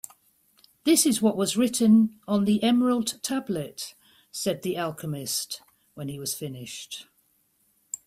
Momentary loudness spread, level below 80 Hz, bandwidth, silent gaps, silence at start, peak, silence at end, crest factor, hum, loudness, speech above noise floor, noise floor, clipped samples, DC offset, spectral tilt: 19 LU; -66 dBFS; 16 kHz; none; 0.85 s; -8 dBFS; 0.1 s; 18 dB; none; -25 LUFS; 43 dB; -68 dBFS; under 0.1%; under 0.1%; -4 dB/octave